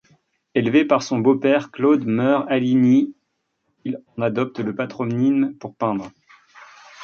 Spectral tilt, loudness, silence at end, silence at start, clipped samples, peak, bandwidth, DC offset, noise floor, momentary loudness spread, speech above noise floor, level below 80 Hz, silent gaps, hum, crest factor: -7 dB/octave; -20 LUFS; 0 s; 0.55 s; under 0.1%; -2 dBFS; 7 kHz; under 0.1%; -73 dBFS; 12 LU; 54 dB; -64 dBFS; none; none; 18 dB